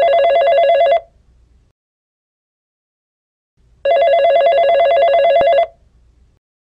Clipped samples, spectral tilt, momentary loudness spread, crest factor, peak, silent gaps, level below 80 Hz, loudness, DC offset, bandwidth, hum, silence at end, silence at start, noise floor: under 0.1%; -3.5 dB/octave; 5 LU; 12 dB; -4 dBFS; 1.71-3.57 s; -52 dBFS; -12 LUFS; under 0.1%; 5.2 kHz; none; 1.1 s; 0 s; -51 dBFS